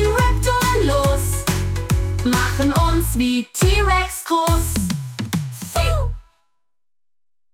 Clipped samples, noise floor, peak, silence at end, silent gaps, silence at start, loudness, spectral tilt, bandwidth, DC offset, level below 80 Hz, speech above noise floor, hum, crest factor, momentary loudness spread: under 0.1%; under -90 dBFS; -4 dBFS; 1.35 s; none; 0 s; -19 LUFS; -5 dB/octave; 18 kHz; under 0.1%; -24 dBFS; over 72 dB; none; 16 dB; 8 LU